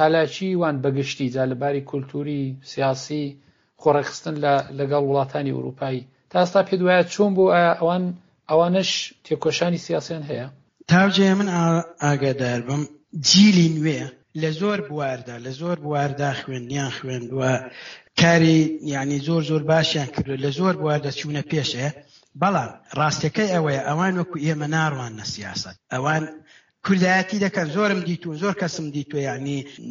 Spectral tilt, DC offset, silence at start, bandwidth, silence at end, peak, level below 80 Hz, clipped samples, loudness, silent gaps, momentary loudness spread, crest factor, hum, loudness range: -4.5 dB/octave; under 0.1%; 0 s; 7.4 kHz; 0 s; -2 dBFS; -60 dBFS; under 0.1%; -22 LUFS; none; 12 LU; 20 dB; none; 5 LU